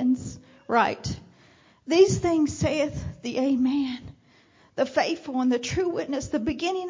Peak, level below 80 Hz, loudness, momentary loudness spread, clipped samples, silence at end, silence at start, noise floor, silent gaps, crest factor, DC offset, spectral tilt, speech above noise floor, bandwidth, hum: -6 dBFS; -48 dBFS; -25 LUFS; 16 LU; under 0.1%; 0 s; 0 s; -58 dBFS; none; 18 dB; under 0.1%; -5.5 dB/octave; 34 dB; 7.6 kHz; none